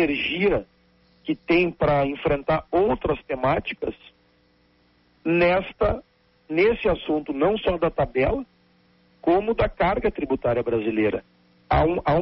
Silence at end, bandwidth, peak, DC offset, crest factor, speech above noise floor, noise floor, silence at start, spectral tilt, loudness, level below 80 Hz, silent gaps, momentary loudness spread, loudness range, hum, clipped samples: 0 s; 5.8 kHz; -8 dBFS; under 0.1%; 16 dB; 39 dB; -61 dBFS; 0 s; -4.5 dB/octave; -23 LUFS; -40 dBFS; none; 10 LU; 3 LU; none; under 0.1%